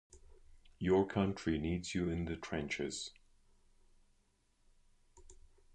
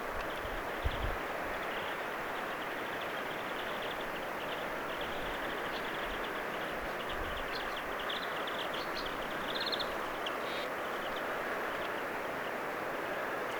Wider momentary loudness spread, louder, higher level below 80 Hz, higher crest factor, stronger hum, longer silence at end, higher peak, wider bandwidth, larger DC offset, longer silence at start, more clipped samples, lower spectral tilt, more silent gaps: first, 9 LU vs 2 LU; about the same, -37 LUFS vs -37 LUFS; about the same, -56 dBFS vs -52 dBFS; about the same, 22 dB vs 18 dB; neither; first, 0.4 s vs 0 s; about the same, -18 dBFS vs -20 dBFS; second, 9.8 kHz vs over 20 kHz; neither; first, 0.15 s vs 0 s; neither; first, -5.5 dB/octave vs -3.5 dB/octave; neither